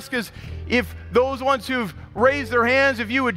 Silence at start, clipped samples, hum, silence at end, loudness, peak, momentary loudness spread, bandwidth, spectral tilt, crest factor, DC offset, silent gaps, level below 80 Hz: 0 s; under 0.1%; none; 0 s; -21 LUFS; -6 dBFS; 10 LU; 16 kHz; -5 dB/octave; 16 dB; under 0.1%; none; -42 dBFS